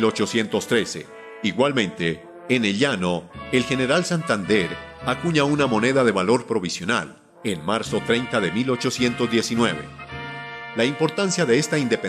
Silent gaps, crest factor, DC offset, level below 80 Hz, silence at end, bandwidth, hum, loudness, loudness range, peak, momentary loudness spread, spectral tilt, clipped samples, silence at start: none; 16 dB; under 0.1%; -52 dBFS; 0 s; 14 kHz; none; -22 LUFS; 2 LU; -6 dBFS; 11 LU; -4.5 dB/octave; under 0.1%; 0 s